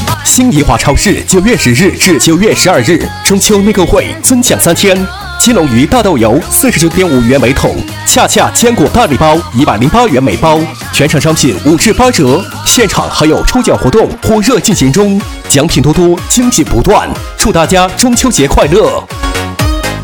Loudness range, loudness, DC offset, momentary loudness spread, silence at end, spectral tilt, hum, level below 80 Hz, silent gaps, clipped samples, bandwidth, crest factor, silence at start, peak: 1 LU; -7 LUFS; 0.4%; 4 LU; 0 s; -4 dB/octave; none; -22 dBFS; none; 1%; over 20 kHz; 8 dB; 0 s; 0 dBFS